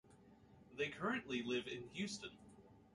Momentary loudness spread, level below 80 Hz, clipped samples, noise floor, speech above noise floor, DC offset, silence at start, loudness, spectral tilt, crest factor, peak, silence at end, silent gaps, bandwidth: 21 LU; -74 dBFS; under 0.1%; -66 dBFS; 22 dB; under 0.1%; 0.05 s; -44 LUFS; -4 dB/octave; 18 dB; -28 dBFS; 0.05 s; none; 11.5 kHz